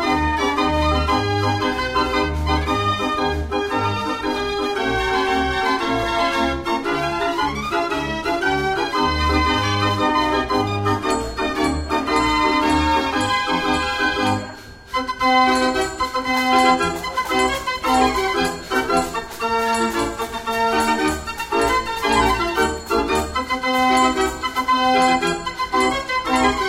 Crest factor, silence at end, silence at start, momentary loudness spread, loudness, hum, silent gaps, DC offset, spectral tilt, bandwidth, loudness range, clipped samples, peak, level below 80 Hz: 16 dB; 0 s; 0 s; 6 LU; -19 LUFS; none; none; under 0.1%; -4.5 dB/octave; 16 kHz; 2 LU; under 0.1%; -2 dBFS; -34 dBFS